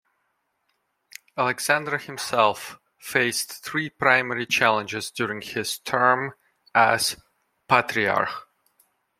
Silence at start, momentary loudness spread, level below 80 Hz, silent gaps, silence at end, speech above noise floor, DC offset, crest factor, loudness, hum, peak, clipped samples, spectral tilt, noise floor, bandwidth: 1.35 s; 11 LU; -66 dBFS; none; 0.8 s; 50 dB; under 0.1%; 22 dB; -23 LUFS; none; -2 dBFS; under 0.1%; -3 dB/octave; -74 dBFS; 16.5 kHz